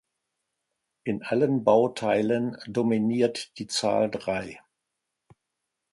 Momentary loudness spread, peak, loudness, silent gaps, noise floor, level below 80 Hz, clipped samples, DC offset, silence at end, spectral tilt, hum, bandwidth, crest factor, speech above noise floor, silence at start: 11 LU; -6 dBFS; -26 LUFS; none; -83 dBFS; -66 dBFS; under 0.1%; under 0.1%; 1.35 s; -5.5 dB/octave; none; 11.5 kHz; 20 dB; 58 dB; 1.05 s